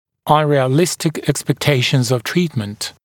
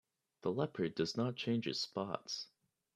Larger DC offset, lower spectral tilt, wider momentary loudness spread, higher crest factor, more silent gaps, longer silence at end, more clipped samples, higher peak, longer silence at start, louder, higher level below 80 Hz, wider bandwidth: neither; about the same, -5 dB/octave vs -5 dB/octave; about the same, 7 LU vs 7 LU; about the same, 16 dB vs 20 dB; neither; second, 0.15 s vs 0.5 s; neither; first, 0 dBFS vs -20 dBFS; second, 0.25 s vs 0.45 s; first, -17 LUFS vs -39 LUFS; first, -50 dBFS vs -78 dBFS; first, 18 kHz vs 13 kHz